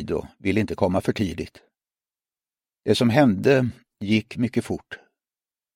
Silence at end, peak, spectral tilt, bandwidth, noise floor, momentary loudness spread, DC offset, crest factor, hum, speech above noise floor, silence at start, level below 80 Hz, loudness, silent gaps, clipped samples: 0.8 s; -2 dBFS; -6.5 dB/octave; 16 kHz; under -90 dBFS; 17 LU; under 0.1%; 22 dB; none; over 68 dB; 0 s; -52 dBFS; -23 LUFS; none; under 0.1%